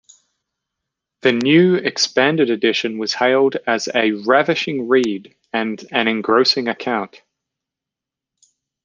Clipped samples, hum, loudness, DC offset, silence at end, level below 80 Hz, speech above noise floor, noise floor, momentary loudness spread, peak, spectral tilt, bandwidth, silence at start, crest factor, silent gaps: under 0.1%; none; -17 LUFS; under 0.1%; 1.75 s; -68 dBFS; 69 dB; -86 dBFS; 9 LU; -2 dBFS; -4.5 dB/octave; 9.6 kHz; 1.25 s; 18 dB; none